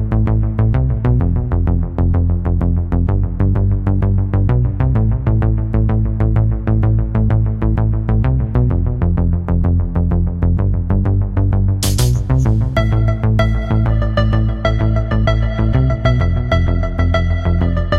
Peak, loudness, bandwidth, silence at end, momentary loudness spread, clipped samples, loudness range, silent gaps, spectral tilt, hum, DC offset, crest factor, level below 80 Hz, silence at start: 0 dBFS; -16 LUFS; 13 kHz; 0 s; 2 LU; under 0.1%; 1 LU; none; -7.5 dB/octave; none; under 0.1%; 12 dB; -20 dBFS; 0 s